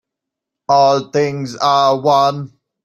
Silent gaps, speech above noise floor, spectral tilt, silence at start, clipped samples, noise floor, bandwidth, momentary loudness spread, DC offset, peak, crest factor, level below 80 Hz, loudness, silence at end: none; 68 dB; -5 dB/octave; 0.7 s; under 0.1%; -82 dBFS; 12.5 kHz; 15 LU; under 0.1%; 0 dBFS; 14 dB; -62 dBFS; -14 LUFS; 0.4 s